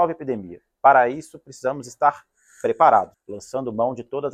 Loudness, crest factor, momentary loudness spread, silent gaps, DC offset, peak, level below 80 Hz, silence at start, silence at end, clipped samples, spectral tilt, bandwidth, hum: -21 LUFS; 20 dB; 18 LU; none; under 0.1%; -2 dBFS; -64 dBFS; 0 s; 0 s; under 0.1%; -5.5 dB/octave; 11.5 kHz; none